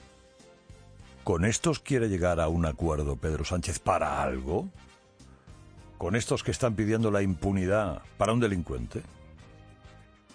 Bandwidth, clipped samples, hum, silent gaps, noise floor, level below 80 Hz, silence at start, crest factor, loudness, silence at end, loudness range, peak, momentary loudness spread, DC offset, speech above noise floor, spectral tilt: 10.5 kHz; under 0.1%; none; none; -56 dBFS; -44 dBFS; 0.7 s; 20 dB; -29 LUFS; 0.35 s; 3 LU; -10 dBFS; 9 LU; under 0.1%; 28 dB; -5.5 dB/octave